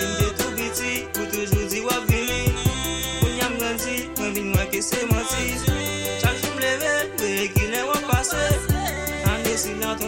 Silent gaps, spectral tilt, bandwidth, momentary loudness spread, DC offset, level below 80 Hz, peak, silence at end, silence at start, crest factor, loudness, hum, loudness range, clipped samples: none; -4 dB/octave; 17 kHz; 4 LU; under 0.1%; -34 dBFS; -6 dBFS; 0 s; 0 s; 18 dB; -23 LUFS; none; 1 LU; under 0.1%